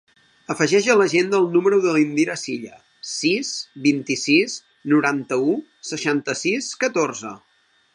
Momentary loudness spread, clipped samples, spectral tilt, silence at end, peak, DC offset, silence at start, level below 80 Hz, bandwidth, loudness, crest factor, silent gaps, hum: 14 LU; under 0.1%; -4 dB/octave; 0.6 s; -2 dBFS; under 0.1%; 0.5 s; -72 dBFS; 11 kHz; -20 LUFS; 18 dB; none; none